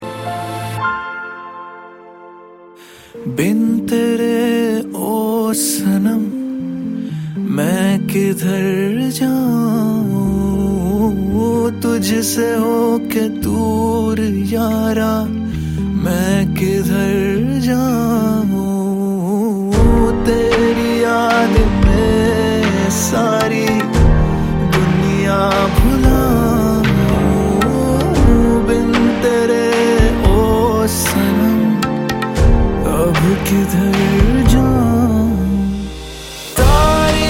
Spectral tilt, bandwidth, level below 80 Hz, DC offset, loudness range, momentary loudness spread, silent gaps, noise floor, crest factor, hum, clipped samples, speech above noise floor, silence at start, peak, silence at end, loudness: -6 dB/octave; 16.5 kHz; -22 dBFS; under 0.1%; 4 LU; 8 LU; none; -40 dBFS; 14 dB; none; under 0.1%; 25 dB; 0 s; 0 dBFS; 0 s; -15 LUFS